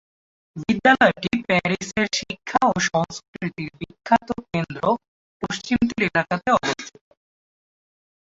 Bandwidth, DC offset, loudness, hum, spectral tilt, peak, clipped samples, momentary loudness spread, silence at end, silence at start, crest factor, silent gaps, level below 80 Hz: 8 kHz; under 0.1%; -22 LUFS; none; -4.5 dB/octave; -2 dBFS; under 0.1%; 14 LU; 1.5 s; 0.55 s; 22 dB; 3.28-3.33 s, 5.08-5.40 s; -52 dBFS